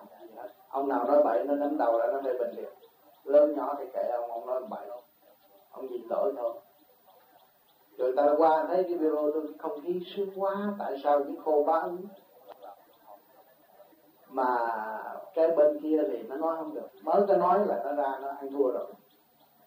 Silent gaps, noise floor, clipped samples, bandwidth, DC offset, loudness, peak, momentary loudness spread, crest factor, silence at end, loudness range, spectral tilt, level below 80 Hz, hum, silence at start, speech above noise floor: none; -63 dBFS; under 0.1%; 15.5 kHz; under 0.1%; -29 LUFS; -12 dBFS; 19 LU; 18 dB; 0.7 s; 8 LU; -7.5 dB/octave; under -90 dBFS; none; 0 s; 35 dB